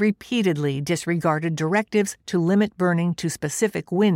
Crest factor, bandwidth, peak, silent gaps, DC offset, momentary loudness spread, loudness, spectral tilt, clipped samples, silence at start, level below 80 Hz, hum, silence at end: 14 dB; 16 kHz; -8 dBFS; none; under 0.1%; 4 LU; -23 LUFS; -5.5 dB/octave; under 0.1%; 0 s; -60 dBFS; none; 0 s